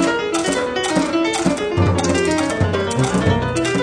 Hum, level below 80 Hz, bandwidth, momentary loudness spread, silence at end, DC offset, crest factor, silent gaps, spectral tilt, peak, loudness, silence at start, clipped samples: none; -38 dBFS; 10.5 kHz; 2 LU; 0 s; under 0.1%; 14 dB; none; -5 dB/octave; -2 dBFS; -18 LUFS; 0 s; under 0.1%